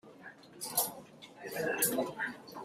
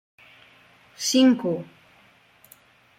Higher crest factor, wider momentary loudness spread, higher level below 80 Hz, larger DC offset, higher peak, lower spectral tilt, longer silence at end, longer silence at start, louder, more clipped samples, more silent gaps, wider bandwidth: first, 24 dB vs 18 dB; first, 21 LU vs 15 LU; about the same, -76 dBFS vs -72 dBFS; neither; second, -14 dBFS vs -8 dBFS; second, -2 dB/octave vs -3.5 dB/octave; second, 0 s vs 1.35 s; second, 0.05 s vs 1 s; second, -34 LUFS vs -22 LUFS; neither; neither; about the same, 16 kHz vs 15.5 kHz